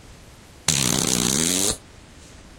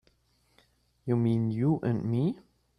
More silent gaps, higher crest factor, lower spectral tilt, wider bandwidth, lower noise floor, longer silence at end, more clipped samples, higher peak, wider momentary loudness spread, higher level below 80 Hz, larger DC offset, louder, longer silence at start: neither; first, 22 dB vs 16 dB; second, -2 dB/octave vs -10.5 dB/octave; first, 17 kHz vs 5.6 kHz; second, -46 dBFS vs -69 dBFS; second, 0.05 s vs 0.4 s; neither; first, -2 dBFS vs -14 dBFS; second, 6 LU vs 9 LU; first, -44 dBFS vs -62 dBFS; neither; first, -20 LUFS vs -29 LUFS; second, 0.05 s vs 1.05 s